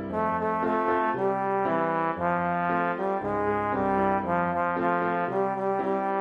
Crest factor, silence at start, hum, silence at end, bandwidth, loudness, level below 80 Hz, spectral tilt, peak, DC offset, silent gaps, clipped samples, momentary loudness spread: 14 dB; 0 s; none; 0 s; 7.8 kHz; -26 LUFS; -56 dBFS; -8.5 dB/octave; -12 dBFS; under 0.1%; none; under 0.1%; 2 LU